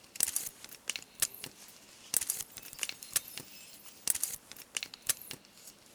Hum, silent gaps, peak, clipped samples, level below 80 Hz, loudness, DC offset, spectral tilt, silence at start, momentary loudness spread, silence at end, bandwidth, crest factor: none; none; -8 dBFS; under 0.1%; -70 dBFS; -35 LUFS; under 0.1%; 1 dB/octave; 0 s; 17 LU; 0 s; over 20 kHz; 32 dB